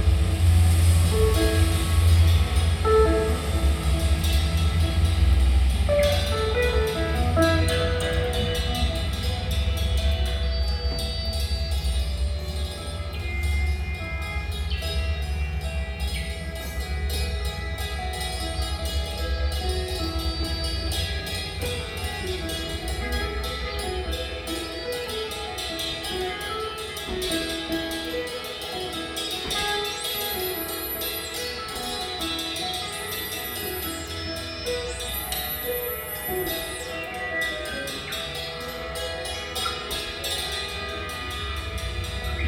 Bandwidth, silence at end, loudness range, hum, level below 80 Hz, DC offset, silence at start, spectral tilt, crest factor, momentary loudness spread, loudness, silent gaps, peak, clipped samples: 18 kHz; 0 s; 7 LU; none; -28 dBFS; under 0.1%; 0 s; -4.5 dB/octave; 18 dB; 9 LU; -26 LUFS; none; -8 dBFS; under 0.1%